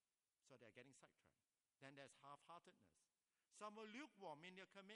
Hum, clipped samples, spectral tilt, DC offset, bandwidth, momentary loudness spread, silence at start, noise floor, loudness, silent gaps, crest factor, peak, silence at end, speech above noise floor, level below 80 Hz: none; under 0.1%; -4 dB/octave; under 0.1%; 11 kHz; 9 LU; 0.45 s; -87 dBFS; -62 LUFS; none; 22 dB; -42 dBFS; 0 s; 24 dB; under -90 dBFS